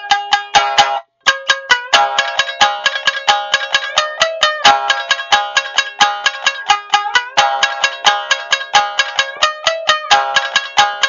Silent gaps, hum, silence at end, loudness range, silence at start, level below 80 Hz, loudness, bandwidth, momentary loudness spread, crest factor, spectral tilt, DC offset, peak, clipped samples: none; none; 0 s; 1 LU; 0 s; -54 dBFS; -13 LUFS; 9.8 kHz; 5 LU; 14 dB; 1 dB/octave; under 0.1%; 0 dBFS; under 0.1%